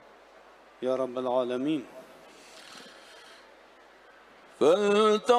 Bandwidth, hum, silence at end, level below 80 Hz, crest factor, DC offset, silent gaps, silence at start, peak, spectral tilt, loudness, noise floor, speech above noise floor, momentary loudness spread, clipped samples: 12.5 kHz; none; 0 s; -76 dBFS; 20 dB; under 0.1%; none; 0.8 s; -10 dBFS; -4.5 dB/octave; -27 LUFS; -55 dBFS; 30 dB; 26 LU; under 0.1%